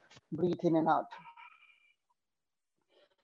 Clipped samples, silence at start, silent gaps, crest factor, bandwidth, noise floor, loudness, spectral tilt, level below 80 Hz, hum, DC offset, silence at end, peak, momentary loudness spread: under 0.1%; 0.3 s; none; 20 dB; 7 kHz; under -90 dBFS; -32 LUFS; -8.5 dB/octave; -80 dBFS; none; under 0.1%; 1.75 s; -16 dBFS; 21 LU